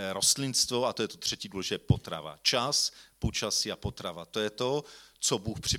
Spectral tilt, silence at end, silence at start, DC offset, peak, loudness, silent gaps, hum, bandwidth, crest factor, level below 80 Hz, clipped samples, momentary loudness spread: -3 dB/octave; 0 s; 0 s; under 0.1%; -10 dBFS; -30 LUFS; none; none; 17.5 kHz; 20 dB; -50 dBFS; under 0.1%; 10 LU